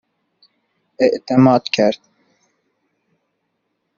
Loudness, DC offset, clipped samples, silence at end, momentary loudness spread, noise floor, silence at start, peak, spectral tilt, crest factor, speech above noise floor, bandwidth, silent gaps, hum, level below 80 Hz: -15 LUFS; under 0.1%; under 0.1%; 2 s; 6 LU; -72 dBFS; 1 s; -2 dBFS; -5.5 dB/octave; 18 dB; 57 dB; 7.2 kHz; none; none; -62 dBFS